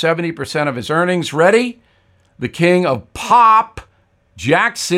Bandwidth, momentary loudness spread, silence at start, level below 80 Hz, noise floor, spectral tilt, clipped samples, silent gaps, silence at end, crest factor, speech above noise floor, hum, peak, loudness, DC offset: 15.5 kHz; 14 LU; 0 s; -50 dBFS; -55 dBFS; -5 dB/octave; under 0.1%; none; 0 s; 14 dB; 41 dB; none; 0 dBFS; -15 LUFS; under 0.1%